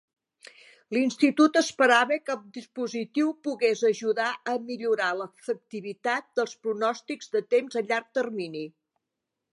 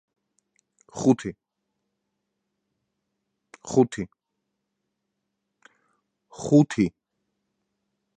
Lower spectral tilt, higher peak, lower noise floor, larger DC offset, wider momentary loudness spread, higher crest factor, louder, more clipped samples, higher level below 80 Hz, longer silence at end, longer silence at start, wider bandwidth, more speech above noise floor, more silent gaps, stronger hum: second, -3.5 dB/octave vs -7 dB/octave; about the same, -6 dBFS vs -6 dBFS; first, -85 dBFS vs -81 dBFS; neither; second, 13 LU vs 18 LU; about the same, 20 dB vs 22 dB; second, -26 LUFS vs -23 LUFS; neither; second, -84 dBFS vs -62 dBFS; second, 0.85 s vs 1.3 s; about the same, 0.9 s vs 0.95 s; first, 11.5 kHz vs 9.6 kHz; about the same, 59 dB vs 59 dB; neither; neither